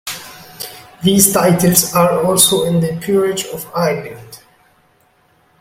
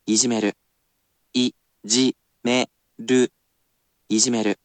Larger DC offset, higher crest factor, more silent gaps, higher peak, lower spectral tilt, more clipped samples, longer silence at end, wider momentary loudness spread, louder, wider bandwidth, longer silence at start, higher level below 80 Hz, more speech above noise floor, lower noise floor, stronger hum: neither; about the same, 16 dB vs 20 dB; neither; first, 0 dBFS vs -4 dBFS; first, -4 dB/octave vs -2.5 dB/octave; neither; first, 1.25 s vs 0.1 s; first, 19 LU vs 10 LU; first, -13 LUFS vs -22 LUFS; first, 17 kHz vs 9.2 kHz; about the same, 0.05 s vs 0.05 s; first, -50 dBFS vs -72 dBFS; second, 41 dB vs 50 dB; second, -55 dBFS vs -71 dBFS; neither